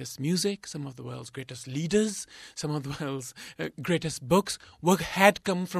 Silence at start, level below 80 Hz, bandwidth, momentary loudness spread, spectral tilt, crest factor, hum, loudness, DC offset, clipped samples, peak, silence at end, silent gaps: 0 s; -58 dBFS; 14.5 kHz; 17 LU; -4.5 dB/octave; 26 dB; none; -28 LUFS; under 0.1%; under 0.1%; -4 dBFS; 0 s; none